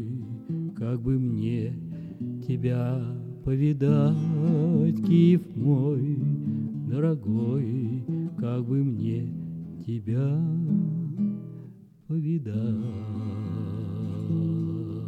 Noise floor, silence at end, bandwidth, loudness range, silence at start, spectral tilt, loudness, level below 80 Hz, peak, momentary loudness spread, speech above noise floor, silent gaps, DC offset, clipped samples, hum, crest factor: -46 dBFS; 0 s; 4.6 kHz; 7 LU; 0 s; -10.5 dB/octave; -27 LUFS; -56 dBFS; -10 dBFS; 11 LU; 22 dB; none; under 0.1%; under 0.1%; none; 16 dB